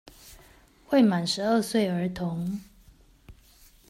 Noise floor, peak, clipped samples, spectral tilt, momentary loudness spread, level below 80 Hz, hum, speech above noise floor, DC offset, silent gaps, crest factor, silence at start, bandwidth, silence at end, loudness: -56 dBFS; -10 dBFS; under 0.1%; -5.5 dB/octave; 11 LU; -56 dBFS; none; 31 dB; under 0.1%; none; 18 dB; 0.25 s; 16 kHz; 0.55 s; -26 LUFS